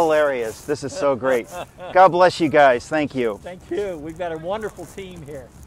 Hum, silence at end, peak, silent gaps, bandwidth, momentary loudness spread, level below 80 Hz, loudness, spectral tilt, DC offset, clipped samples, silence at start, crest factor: none; 0 s; -2 dBFS; none; 16 kHz; 20 LU; -50 dBFS; -20 LUFS; -5 dB/octave; under 0.1%; under 0.1%; 0 s; 18 dB